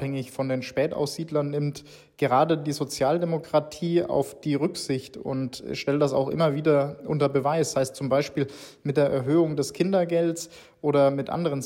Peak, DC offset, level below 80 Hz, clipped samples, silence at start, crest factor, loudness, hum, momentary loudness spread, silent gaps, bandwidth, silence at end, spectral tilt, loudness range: -10 dBFS; under 0.1%; -62 dBFS; under 0.1%; 0 s; 16 dB; -25 LUFS; none; 9 LU; none; 16 kHz; 0 s; -6 dB/octave; 2 LU